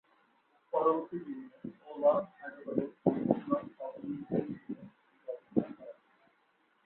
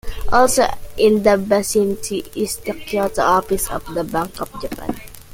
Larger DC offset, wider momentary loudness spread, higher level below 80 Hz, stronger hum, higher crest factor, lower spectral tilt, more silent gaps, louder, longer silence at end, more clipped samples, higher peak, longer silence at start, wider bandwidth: neither; first, 16 LU vs 13 LU; second, -74 dBFS vs -34 dBFS; neither; first, 24 dB vs 18 dB; first, -8.5 dB/octave vs -4 dB/octave; neither; second, -34 LUFS vs -19 LUFS; first, 0.95 s vs 0 s; neither; second, -12 dBFS vs 0 dBFS; first, 0.75 s vs 0.05 s; second, 4.2 kHz vs 17 kHz